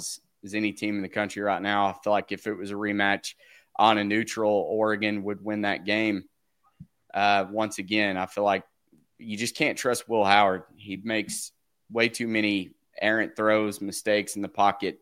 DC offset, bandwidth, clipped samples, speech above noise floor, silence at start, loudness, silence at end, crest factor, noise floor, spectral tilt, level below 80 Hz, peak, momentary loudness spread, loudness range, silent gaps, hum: under 0.1%; 16.5 kHz; under 0.1%; 37 dB; 0 s; -26 LUFS; 0.05 s; 24 dB; -63 dBFS; -4 dB/octave; -70 dBFS; -2 dBFS; 11 LU; 2 LU; none; none